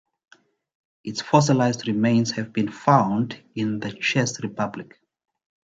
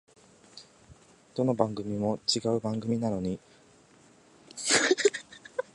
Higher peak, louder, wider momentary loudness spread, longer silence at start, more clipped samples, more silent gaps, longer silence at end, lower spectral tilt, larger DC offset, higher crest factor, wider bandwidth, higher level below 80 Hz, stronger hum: first, -2 dBFS vs -6 dBFS; first, -23 LUFS vs -28 LUFS; second, 11 LU vs 18 LU; first, 1.05 s vs 0.55 s; neither; neither; first, 0.95 s vs 0.15 s; first, -5.5 dB/octave vs -3.5 dB/octave; neither; about the same, 22 dB vs 24 dB; second, 9.2 kHz vs 11.5 kHz; about the same, -62 dBFS vs -62 dBFS; neither